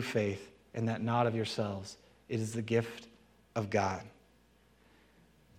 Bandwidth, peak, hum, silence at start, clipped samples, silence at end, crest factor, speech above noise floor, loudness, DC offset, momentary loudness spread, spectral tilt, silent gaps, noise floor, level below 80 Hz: 14.5 kHz; -16 dBFS; none; 0 s; under 0.1%; 1.45 s; 20 dB; 32 dB; -35 LUFS; under 0.1%; 15 LU; -6 dB/octave; none; -66 dBFS; -70 dBFS